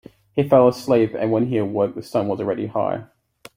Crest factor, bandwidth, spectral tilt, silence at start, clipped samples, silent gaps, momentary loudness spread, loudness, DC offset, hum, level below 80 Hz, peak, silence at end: 18 dB; 16 kHz; -8 dB/octave; 0.35 s; under 0.1%; none; 9 LU; -20 LUFS; under 0.1%; none; -58 dBFS; -2 dBFS; 0.5 s